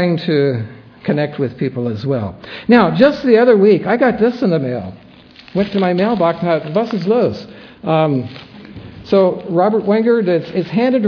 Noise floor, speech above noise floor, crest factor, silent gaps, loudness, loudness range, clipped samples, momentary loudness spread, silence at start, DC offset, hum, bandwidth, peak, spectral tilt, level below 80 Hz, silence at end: -41 dBFS; 27 dB; 14 dB; none; -15 LUFS; 4 LU; under 0.1%; 16 LU; 0 s; under 0.1%; none; 5.4 kHz; 0 dBFS; -9 dB/octave; -52 dBFS; 0 s